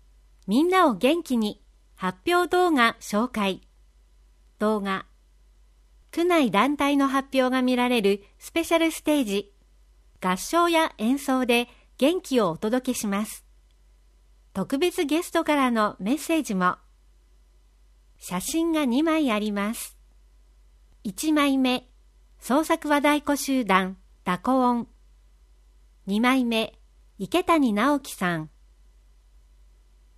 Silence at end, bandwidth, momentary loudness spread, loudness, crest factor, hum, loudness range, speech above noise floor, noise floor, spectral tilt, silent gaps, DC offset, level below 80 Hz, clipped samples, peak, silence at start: 1.7 s; 15.5 kHz; 12 LU; -24 LUFS; 20 dB; none; 4 LU; 34 dB; -57 dBFS; -4.5 dB/octave; none; under 0.1%; -56 dBFS; under 0.1%; -4 dBFS; 0.45 s